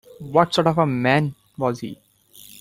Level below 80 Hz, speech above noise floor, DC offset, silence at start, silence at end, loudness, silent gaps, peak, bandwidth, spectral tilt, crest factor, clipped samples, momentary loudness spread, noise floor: -56 dBFS; 28 dB; under 0.1%; 0.2 s; 0.65 s; -20 LUFS; none; -2 dBFS; 16.5 kHz; -6 dB/octave; 20 dB; under 0.1%; 11 LU; -48 dBFS